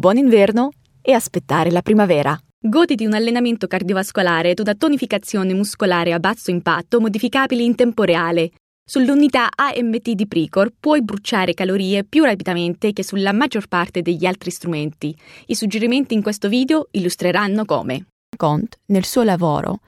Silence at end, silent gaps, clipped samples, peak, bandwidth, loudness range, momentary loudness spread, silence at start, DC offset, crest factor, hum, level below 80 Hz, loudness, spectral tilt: 0.1 s; 2.53-2.62 s, 8.60-8.86 s, 18.12-18.33 s; under 0.1%; 0 dBFS; 16 kHz; 3 LU; 7 LU; 0 s; under 0.1%; 16 dB; none; -56 dBFS; -18 LUFS; -5.5 dB/octave